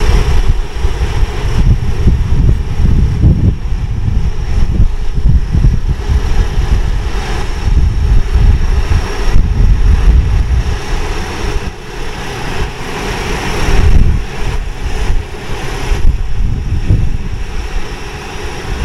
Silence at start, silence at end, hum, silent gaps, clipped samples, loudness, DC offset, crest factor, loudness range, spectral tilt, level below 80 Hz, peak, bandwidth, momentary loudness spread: 0 s; 0 s; none; none; 0.2%; -15 LUFS; 0.9%; 10 dB; 5 LU; -6 dB/octave; -12 dBFS; 0 dBFS; 12 kHz; 10 LU